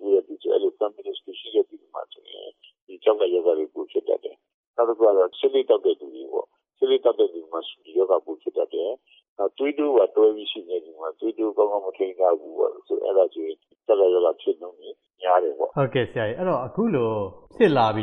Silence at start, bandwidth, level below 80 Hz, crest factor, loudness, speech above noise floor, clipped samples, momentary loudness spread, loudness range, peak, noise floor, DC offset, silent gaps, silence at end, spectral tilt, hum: 0 s; 4.5 kHz; -66 dBFS; 18 dB; -23 LUFS; 22 dB; under 0.1%; 16 LU; 3 LU; -6 dBFS; -44 dBFS; under 0.1%; 2.82-2.87 s, 4.54-4.74 s, 9.29-9.36 s; 0 s; -8.5 dB/octave; none